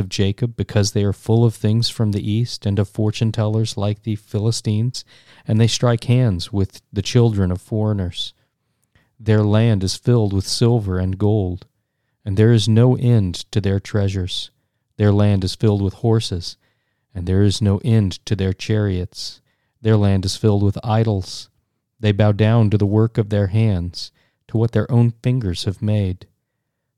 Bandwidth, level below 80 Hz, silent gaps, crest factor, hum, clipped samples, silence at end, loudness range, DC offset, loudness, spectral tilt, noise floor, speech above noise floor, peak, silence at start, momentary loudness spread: 11.5 kHz; -46 dBFS; none; 16 dB; none; under 0.1%; 0.75 s; 3 LU; 0.4%; -19 LUFS; -6.5 dB/octave; -75 dBFS; 57 dB; -2 dBFS; 0 s; 10 LU